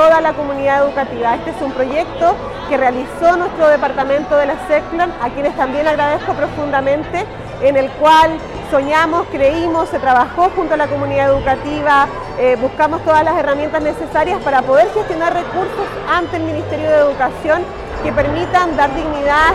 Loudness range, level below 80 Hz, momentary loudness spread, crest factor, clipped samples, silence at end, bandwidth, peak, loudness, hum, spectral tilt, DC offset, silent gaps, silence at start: 2 LU; -36 dBFS; 7 LU; 12 dB; under 0.1%; 0 s; 13 kHz; -4 dBFS; -15 LUFS; none; -5.5 dB/octave; under 0.1%; none; 0 s